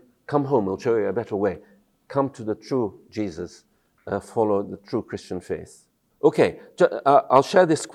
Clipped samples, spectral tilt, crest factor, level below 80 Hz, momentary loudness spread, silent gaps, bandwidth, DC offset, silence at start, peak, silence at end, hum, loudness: under 0.1%; -6 dB/octave; 22 dB; -62 dBFS; 15 LU; none; 12 kHz; under 0.1%; 0.3 s; -2 dBFS; 0.05 s; none; -23 LUFS